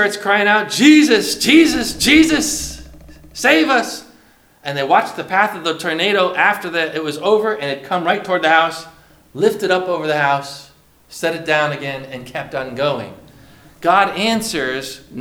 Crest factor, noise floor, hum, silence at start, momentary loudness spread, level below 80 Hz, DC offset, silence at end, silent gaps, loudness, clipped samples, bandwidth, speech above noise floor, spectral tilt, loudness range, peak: 16 dB; -50 dBFS; none; 0 s; 17 LU; -46 dBFS; under 0.1%; 0 s; none; -16 LUFS; under 0.1%; 17 kHz; 34 dB; -3.5 dB/octave; 7 LU; 0 dBFS